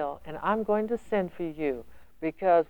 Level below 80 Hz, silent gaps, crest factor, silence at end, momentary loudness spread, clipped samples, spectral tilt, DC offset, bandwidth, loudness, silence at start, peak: -56 dBFS; none; 16 dB; 0 s; 9 LU; under 0.1%; -8 dB/octave; 0.4%; 20 kHz; -30 LUFS; 0 s; -12 dBFS